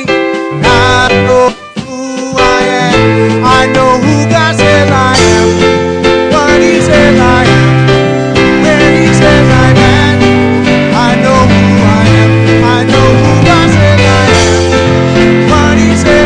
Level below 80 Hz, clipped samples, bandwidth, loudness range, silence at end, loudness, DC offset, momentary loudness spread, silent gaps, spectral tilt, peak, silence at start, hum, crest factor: -24 dBFS; 3%; 11 kHz; 2 LU; 0 s; -6 LUFS; under 0.1%; 3 LU; none; -5.5 dB/octave; 0 dBFS; 0 s; none; 6 dB